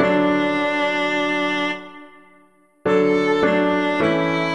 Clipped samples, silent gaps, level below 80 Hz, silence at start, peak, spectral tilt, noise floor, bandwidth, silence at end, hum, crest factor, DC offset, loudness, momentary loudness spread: under 0.1%; none; -56 dBFS; 0 s; -4 dBFS; -6 dB/octave; -55 dBFS; 10.5 kHz; 0 s; none; 16 dB; 0.3%; -19 LUFS; 6 LU